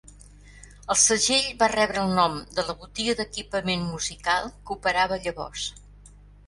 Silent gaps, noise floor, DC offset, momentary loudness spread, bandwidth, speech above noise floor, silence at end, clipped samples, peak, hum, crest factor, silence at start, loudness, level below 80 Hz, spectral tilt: none; -49 dBFS; under 0.1%; 13 LU; 11.5 kHz; 24 dB; 0.4 s; under 0.1%; -6 dBFS; 50 Hz at -45 dBFS; 20 dB; 0.05 s; -24 LUFS; -48 dBFS; -2 dB/octave